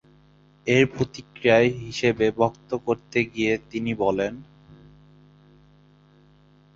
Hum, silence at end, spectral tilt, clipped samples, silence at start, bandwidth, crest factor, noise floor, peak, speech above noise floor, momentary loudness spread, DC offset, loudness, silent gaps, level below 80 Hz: 50 Hz at -60 dBFS; 2.35 s; -6 dB/octave; under 0.1%; 0.65 s; 7.8 kHz; 22 dB; -56 dBFS; -4 dBFS; 33 dB; 10 LU; under 0.1%; -23 LUFS; none; -56 dBFS